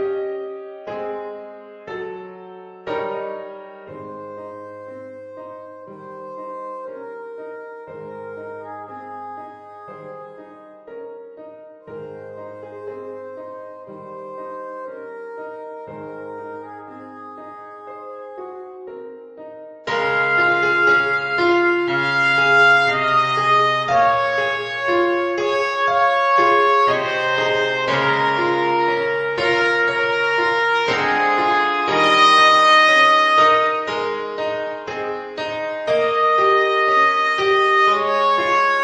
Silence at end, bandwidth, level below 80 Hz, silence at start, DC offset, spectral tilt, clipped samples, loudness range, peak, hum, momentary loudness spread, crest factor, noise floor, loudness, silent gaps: 0 s; 9.8 kHz; -62 dBFS; 0 s; under 0.1%; -4 dB/octave; under 0.1%; 21 LU; -2 dBFS; none; 23 LU; 18 dB; -41 dBFS; -16 LUFS; none